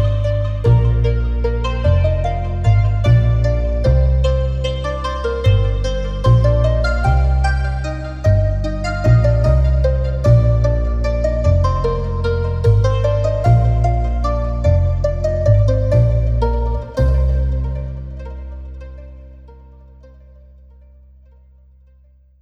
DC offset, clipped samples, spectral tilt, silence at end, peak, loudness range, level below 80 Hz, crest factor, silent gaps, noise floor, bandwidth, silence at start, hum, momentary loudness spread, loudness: under 0.1%; under 0.1%; -8 dB/octave; 2.8 s; 0 dBFS; 6 LU; -20 dBFS; 14 dB; none; -49 dBFS; 8 kHz; 0 s; 50 Hz at -35 dBFS; 8 LU; -17 LUFS